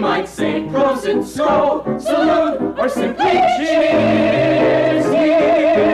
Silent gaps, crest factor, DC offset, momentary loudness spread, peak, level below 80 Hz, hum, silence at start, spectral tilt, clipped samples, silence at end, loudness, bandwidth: none; 8 dB; under 0.1%; 6 LU; -6 dBFS; -46 dBFS; none; 0 s; -6 dB/octave; under 0.1%; 0 s; -15 LUFS; 13.5 kHz